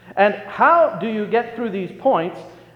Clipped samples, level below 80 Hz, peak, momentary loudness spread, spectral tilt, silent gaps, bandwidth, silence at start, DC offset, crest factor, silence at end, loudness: under 0.1%; -64 dBFS; -2 dBFS; 12 LU; -7.5 dB/octave; none; 6.8 kHz; 0.05 s; under 0.1%; 16 dB; 0.2 s; -19 LUFS